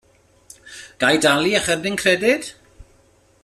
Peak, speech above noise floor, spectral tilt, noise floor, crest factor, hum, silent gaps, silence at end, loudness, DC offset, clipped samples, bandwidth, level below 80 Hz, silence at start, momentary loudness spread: -2 dBFS; 38 dB; -3 dB/octave; -56 dBFS; 20 dB; none; none; 0.9 s; -18 LUFS; under 0.1%; under 0.1%; 14 kHz; -54 dBFS; 0.65 s; 22 LU